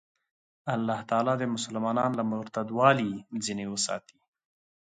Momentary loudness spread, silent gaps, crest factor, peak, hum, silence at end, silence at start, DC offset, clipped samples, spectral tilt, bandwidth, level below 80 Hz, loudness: 10 LU; none; 22 dB; -8 dBFS; none; 0.9 s; 0.65 s; under 0.1%; under 0.1%; -4.5 dB/octave; 9.6 kHz; -70 dBFS; -29 LUFS